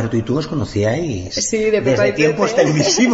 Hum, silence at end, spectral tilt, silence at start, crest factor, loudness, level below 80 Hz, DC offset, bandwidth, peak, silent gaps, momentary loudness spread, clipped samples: none; 0 s; -4.5 dB/octave; 0 s; 14 dB; -17 LUFS; -42 dBFS; under 0.1%; 8 kHz; -2 dBFS; none; 7 LU; under 0.1%